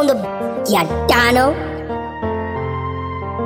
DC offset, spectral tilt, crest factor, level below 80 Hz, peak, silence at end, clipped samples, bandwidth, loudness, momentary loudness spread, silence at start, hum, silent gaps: under 0.1%; -5 dB/octave; 16 dB; -34 dBFS; -2 dBFS; 0 s; under 0.1%; 16.5 kHz; -18 LUFS; 12 LU; 0 s; none; none